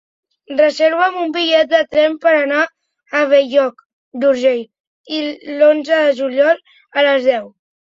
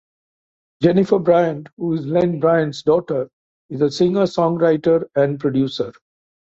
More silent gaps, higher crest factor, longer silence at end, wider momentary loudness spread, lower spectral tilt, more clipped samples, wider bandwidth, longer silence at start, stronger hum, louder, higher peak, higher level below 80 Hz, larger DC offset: first, 3.85-4.12 s, 4.80-5.04 s vs 1.72-1.77 s, 3.33-3.69 s; about the same, 14 dB vs 16 dB; second, 0.45 s vs 0.6 s; about the same, 10 LU vs 9 LU; second, -3 dB/octave vs -7.5 dB/octave; neither; about the same, 7.6 kHz vs 7.8 kHz; second, 0.5 s vs 0.8 s; neither; first, -15 LUFS vs -18 LUFS; about the same, -2 dBFS vs -2 dBFS; second, -66 dBFS vs -58 dBFS; neither